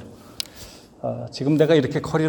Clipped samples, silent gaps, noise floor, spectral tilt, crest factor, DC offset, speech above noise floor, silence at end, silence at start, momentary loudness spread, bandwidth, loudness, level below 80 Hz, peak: under 0.1%; none; -43 dBFS; -6.5 dB/octave; 22 dB; under 0.1%; 23 dB; 0 s; 0 s; 18 LU; 18 kHz; -22 LUFS; -54 dBFS; 0 dBFS